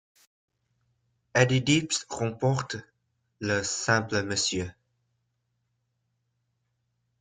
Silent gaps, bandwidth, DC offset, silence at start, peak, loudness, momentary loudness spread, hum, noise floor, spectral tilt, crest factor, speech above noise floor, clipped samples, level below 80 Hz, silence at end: none; 9.6 kHz; under 0.1%; 1.35 s; -8 dBFS; -27 LUFS; 12 LU; none; -77 dBFS; -4 dB/octave; 24 dB; 51 dB; under 0.1%; -62 dBFS; 2.5 s